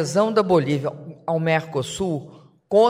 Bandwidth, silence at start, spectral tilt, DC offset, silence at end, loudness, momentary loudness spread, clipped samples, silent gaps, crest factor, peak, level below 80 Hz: 15.5 kHz; 0 s; -6 dB/octave; under 0.1%; 0 s; -22 LUFS; 11 LU; under 0.1%; none; 16 dB; -6 dBFS; -56 dBFS